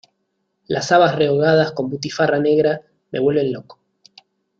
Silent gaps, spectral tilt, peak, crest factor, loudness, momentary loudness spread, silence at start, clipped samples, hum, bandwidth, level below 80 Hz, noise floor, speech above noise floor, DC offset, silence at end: none; -5.5 dB/octave; -2 dBFS; 18 dB; -18 LUFS; 11 LU; 0.7 s; under 0.1%; none; 7.8 kHz; -60 dBFS; -71 dBFS; 55 dB; under 0.1%; 0.85 s